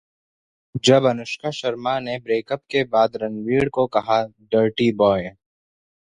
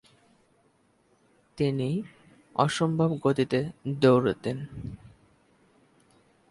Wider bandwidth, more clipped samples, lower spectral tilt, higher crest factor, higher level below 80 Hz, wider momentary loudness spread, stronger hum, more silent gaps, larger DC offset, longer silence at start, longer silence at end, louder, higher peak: about the same, 11 kHz vs 11.5 kHz; neither; second, -5.5 dB/octave vs -7 dB/octave; about the same, 18 dB vs 22 dB; about the same, -54 dBFS vs -58 dBFS; second, 9 LU vs 18 LU; neither; neither; neither; second, 0.75 s vs 1.55 s; second, 0.85 s vs 1.55 s; first, -21 LUFS vs -27 LUFS; first, -2 dBFS vs -6 dBFS